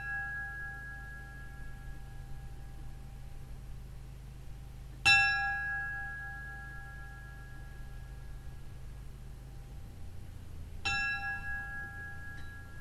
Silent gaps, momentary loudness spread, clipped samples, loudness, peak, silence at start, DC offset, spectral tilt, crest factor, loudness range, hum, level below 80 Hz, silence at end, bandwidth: none; 18 LU; under 0.1%; -33 LUFS; -12 dBFS; 0 s; under 0.1%; -2.5 dB/octave; 26 dB; 18 LU; none; -48 dBFS; 0 s; 14.5 kHz